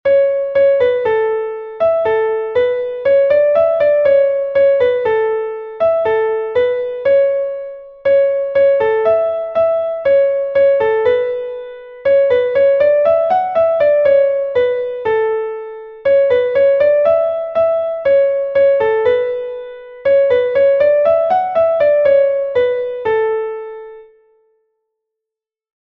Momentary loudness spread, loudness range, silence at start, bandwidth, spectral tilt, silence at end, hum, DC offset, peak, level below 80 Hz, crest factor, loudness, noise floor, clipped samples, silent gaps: 9 LU; 2 LU; 0.05 s; 4.5 kHz; -6 dB/octave; 1.8 s; none; under 0.1%; -2 dBFS; -54 dBFS; 12 dB; -14 LUFS; -85 dBFS; under 0.1%; none